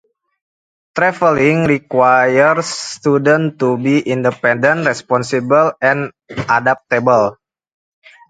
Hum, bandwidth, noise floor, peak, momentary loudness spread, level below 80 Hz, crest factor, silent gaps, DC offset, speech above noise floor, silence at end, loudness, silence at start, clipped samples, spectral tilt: none; 9.4 kHz; under -90 dBFS; 0 dBFS; 7 LU; -54 dBFS; 14 dB; none; under 0.1%; over 76 dB; 0.95 s; -14 LUFS; 0.95 s; under 0.1%; -5.5 dB/octave